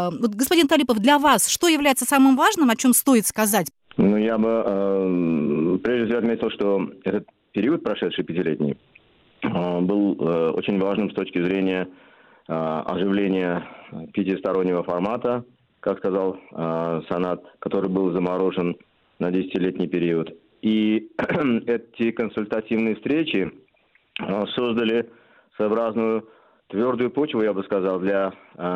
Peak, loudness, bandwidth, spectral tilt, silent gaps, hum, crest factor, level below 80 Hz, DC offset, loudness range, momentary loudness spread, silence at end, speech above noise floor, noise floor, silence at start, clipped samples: -4 dBFS; -22 LUFS; 16 kHz; -4.5 dB/octave; none; none; 18 dB; -60 dBFS; under 0.1%; 7 LU; 11 LU; 0 s; 41 dB; -62 dBFS; 0 s; under 0.1%